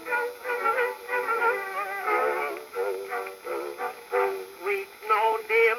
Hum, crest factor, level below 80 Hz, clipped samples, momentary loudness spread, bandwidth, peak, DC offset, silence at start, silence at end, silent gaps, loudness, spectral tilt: none; 16 dB; -76 dBFS; under 0.1%; 10 LU; 17 kHz; -10 dBFS; under 0.1%; 0 s; 0 s; none; -28 LUFS; -2 dB/octave